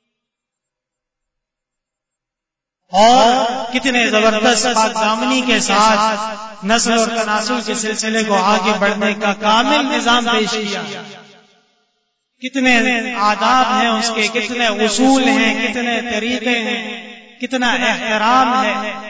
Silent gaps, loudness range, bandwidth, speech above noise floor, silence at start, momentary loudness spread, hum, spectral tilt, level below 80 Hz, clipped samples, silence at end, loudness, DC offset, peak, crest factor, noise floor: none; 4 LU; 8 kHz; 69 dB; 2.9 s; 9 LU; none; -2.5 dB/octave; -52 dBFS; under 0.1%; 0 s; -14 LUFS; under 0.1%; -2 dBFS; 14 dB; -84 dBFS